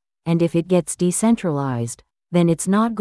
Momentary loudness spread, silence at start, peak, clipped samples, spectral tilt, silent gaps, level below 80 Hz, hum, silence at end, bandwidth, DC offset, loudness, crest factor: 8 LU; 0.25 s; -6 dBFS; under 0.1%; -6 dB/octave; none; -56 dBFS; none; 0 s; 12 kHz; under 0.1%; -20 LUFS; 14 dB